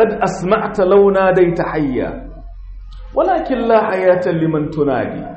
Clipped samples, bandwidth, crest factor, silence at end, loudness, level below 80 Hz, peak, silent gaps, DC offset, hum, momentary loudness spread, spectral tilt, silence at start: under 0.1%; 8.4 kHz; 12 dB; 0 s; -15 LUFS; -36 dBFS; -2 dBFS; none; under 0.1%; none; 10 LU; -7.5 dB/octave; 0 s